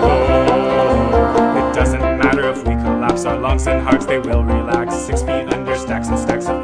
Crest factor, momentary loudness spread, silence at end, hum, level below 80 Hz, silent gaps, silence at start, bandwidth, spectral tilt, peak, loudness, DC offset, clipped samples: 14 dB; 6 LU; 0 s; none; -24 dBFS; none; 0 s; 10.5 kHz; -6.5 dB/octave; 0 dBFS; -16 LUFS; under 0.1%; under 0.1%